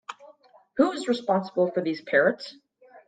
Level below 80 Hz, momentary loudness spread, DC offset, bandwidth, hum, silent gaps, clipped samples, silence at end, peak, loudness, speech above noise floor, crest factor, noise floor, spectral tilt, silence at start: -76 dBFS; 15 LU; under 0.1%; 9.2 kHz; none; none; under 0.1%; 0.1 s; -8 dBFS; -25 LUFS; 31 dB; 20 dB; -55 dBFS; -5.5 dB/octave; 0.1 s